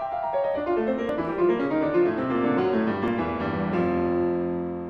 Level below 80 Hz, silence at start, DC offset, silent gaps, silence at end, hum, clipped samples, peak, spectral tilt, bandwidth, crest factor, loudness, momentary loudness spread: -52 dBFS; 0 s; under 0.1%; none; 0 s; none; under 0.1%; -10 dBFS; -9 dB/octave; 5.4 kHz; 14 dB; -25 LUFS; 4 LU